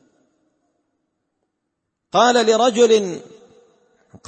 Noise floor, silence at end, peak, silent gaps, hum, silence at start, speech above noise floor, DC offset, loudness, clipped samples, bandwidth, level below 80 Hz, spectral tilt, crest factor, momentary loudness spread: -77 dBFS; 1.1 s; -2 dBFS; none; none; 2.15 s; 62 dB; under 0.1%; -16 LUFS; under 0.1%; 8.8 kHz; -72 dBFS; -3 dB/octave; 18 dB; 12 LU